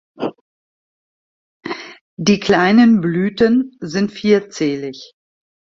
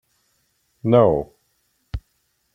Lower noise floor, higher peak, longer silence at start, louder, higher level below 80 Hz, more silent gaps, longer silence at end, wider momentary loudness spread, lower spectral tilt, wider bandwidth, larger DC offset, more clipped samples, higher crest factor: first, under -90 dBFS vs -68 dBFS; about the same, 0 dBFS vs -2 dBFS; second, 0.2 s vs 0.85 s; about the same, -16 LUFS vs -18 LUFS; second, -54 dBFS vs -42 dBFS; first, 0.41-1.60 s, 2.01-2.17 s vs none; first, 0.7 s vs 0.55 s; about the same, 18 LU vs 20 LU; second, -6 dB/octave vs -9.5 dB/octave; about the same, 7.6 kHz vs 7.2 kHz; neither; neither; about the same, 18 dB vs 20 dB